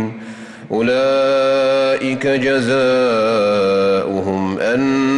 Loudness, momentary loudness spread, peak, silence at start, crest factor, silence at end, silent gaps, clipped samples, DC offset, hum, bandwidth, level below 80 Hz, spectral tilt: -16 LUFS; 7 LU; -6 dBFS; 0 s; 8 dB; 0 s; none; under 0.1%; under 0.1%; none; 11.5 kHz; -56 dBFS; -5.5 dB/octave